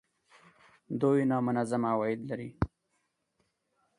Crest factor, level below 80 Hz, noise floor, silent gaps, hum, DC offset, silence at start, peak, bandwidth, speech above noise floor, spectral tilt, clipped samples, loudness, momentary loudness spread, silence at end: 22 dB; -54 dBFS; -78 dBFS; none; none; under 0.1%; 0.9 s; -12 dBFS; 11 kHz; 49 dB; -8 dB/octave; under 0.1%; -31 LUFS; 10 LU; 1.3 s